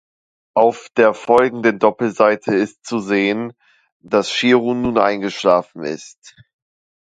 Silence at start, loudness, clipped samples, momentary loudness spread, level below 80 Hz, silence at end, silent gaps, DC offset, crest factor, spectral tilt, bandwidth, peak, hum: 0.55 s; -17 LUFS; under 0.1%; 10 LU; -56 dBFS; 0.7 s; 3.92-4.00 s, 6.18-6.22 s; under 0.1%; 18 dB; -5 dB/octave; 9.4 kHz; 0 dBFS; none